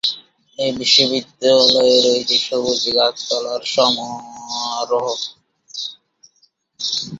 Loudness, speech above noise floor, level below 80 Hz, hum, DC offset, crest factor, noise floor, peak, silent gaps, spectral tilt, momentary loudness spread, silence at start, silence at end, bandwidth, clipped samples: -16 LUFS; 43 dB; -60 dBFS; none; under 0.1%; 18 dB; -60 dBFS; 0 dBFS; none; -2 dB/octave; 16 LU; 0.05 s; 0 s; 7.8 kHz; under 0.1%